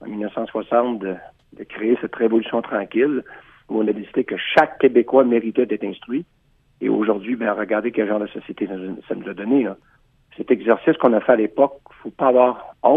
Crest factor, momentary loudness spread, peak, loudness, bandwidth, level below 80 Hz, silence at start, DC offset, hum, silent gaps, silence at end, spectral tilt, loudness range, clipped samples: 20 dB; 13 LU; 0 dBFS; -20 LUFS; 5.8 kHz; -62 dBFS; 0 s; under 0.1%; none; none; 0 s; -8 dB/octave; 4 LU; under 0.1%